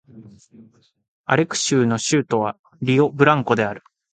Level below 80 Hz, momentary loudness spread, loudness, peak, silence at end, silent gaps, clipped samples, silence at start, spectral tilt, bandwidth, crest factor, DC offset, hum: -60 dBFS; 11 LU; -19 LUFS; 0 dBFS; 0.35 s; 1.08-1.24 s, 2.59-2.64 s; under 0.1%; 0.15 s; -5 dB/octave; 9.4 kHz; 20 dB; under 0.1%; none